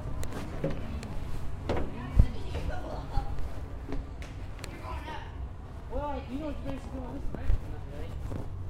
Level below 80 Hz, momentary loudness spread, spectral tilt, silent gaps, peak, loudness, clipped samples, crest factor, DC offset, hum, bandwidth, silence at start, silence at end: -36 dBFS; 10 LU; -7 dB/octave; none; -6 dBFS; -37 LUFS; under 0.1%; 26 dB; under 0.1%; none; 13.5 kHz; 0 s; 0 s